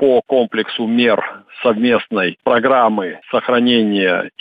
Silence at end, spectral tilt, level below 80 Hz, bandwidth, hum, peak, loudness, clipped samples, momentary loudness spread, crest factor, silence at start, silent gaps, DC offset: 0.1 s; -7.5 dB/octave; -62 dBFS; 5 kHz; none; -2 dBFS; -15 LUFS; under 0.1%; 6 LU; 12 dB; 0 s; none; under 0.1%